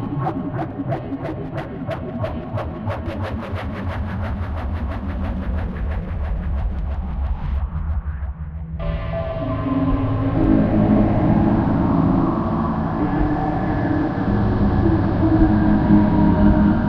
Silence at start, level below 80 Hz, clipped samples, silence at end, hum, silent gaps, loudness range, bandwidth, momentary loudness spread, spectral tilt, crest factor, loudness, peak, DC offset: 0 s; -26 dBFS; under 0.1%; 0 s; none; none; 9 LU; 5.6 kHz; 11 LU; -10.5 dB/octave; 16 dB; -21 LUFS; -2 dBFS; under 0.1%